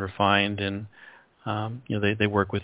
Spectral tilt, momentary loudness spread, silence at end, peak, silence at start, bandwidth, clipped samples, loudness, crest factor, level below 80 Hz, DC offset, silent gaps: -10 dB/octave; 15 LU; 0 s; -6 dBFS; 0 s; 4 kHz; under 0.1%; -25 LUFS; 22 dB; -50 dBFS; under 0.1%; none